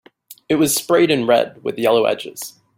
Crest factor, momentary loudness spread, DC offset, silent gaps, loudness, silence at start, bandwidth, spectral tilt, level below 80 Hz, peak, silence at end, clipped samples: 16 dB; 10 LU; under 0.1%; none; -17 LUFS; 0.3 s; 16.5 kHz; -4 dB/octave; -60 dBFS; -2 dBFS; 0.3 s; under 0.1%